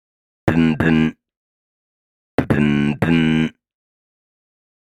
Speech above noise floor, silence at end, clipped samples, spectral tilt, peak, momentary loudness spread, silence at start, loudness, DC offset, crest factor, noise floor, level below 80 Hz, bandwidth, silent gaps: over 74 dB; 1.35 s; under 0.1%; -7.5 dB/octave; 0 dBFS; 9 LU; 0.45 s; -18 LUFS; under 0.1%; 20 dB; under -90 dBFS; -42 dBFS; 11 kHz; 1.37-2.38 s